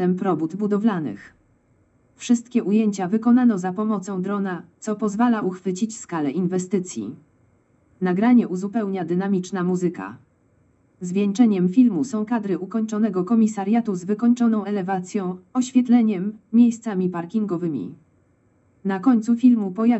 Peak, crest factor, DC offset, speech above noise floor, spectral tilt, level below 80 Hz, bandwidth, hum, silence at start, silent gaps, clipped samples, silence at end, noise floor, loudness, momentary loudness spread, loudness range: -6 dBFS; 16 dB; under 0.1%; 40 dB; -7 dB/octave; -70 dBFS; 8.2 kHz; none; 0 s; none; under 0.1%; 0 s; -61 dBFS; -22 LUFS; 10 LU; 4 LU